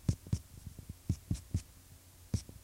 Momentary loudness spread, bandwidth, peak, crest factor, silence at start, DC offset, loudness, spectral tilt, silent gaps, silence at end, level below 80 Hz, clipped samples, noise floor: 18 LU; 16 kHz; -18 dBFS; 22 dB; 0 s; under 0.1%; -41 LUFS; -6.5 dB/octave; none; 0.05 s; -48 dBFS; under 0.1%; -58 dBFS